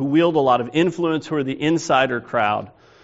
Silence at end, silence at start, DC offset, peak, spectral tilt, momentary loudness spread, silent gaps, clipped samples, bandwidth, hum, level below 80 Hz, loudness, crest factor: 0.35 s; 0 s; under 0.1%; -4 dBFS; -4.5 dB/octave; 6 LU; none; under 0.1%; 8 kHz; none; -60 dBFS; -20 LUFS; 16 dB